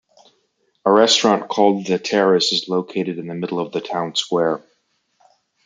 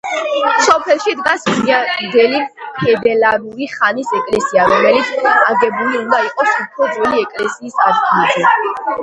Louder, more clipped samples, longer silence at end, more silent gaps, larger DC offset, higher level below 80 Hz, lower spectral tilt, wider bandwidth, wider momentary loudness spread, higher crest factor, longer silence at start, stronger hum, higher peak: second, -18 LUFS vs -13 LUFS; neither; first, 1.05 s vs 0 s; neither; neither; second, -68 dBFS vs -54 dBFS; about the same, -4 dB/octave vs -3.5 dB/octave; about the same, 9.6 kHz vs 10.5 kHz; first, 11 LU vs 7 LU; about the same, 18 dB vs 14 dB; first, 0.85 s vs 0.05 s; neither; about the same, -2 dBFS vs 0 dBFS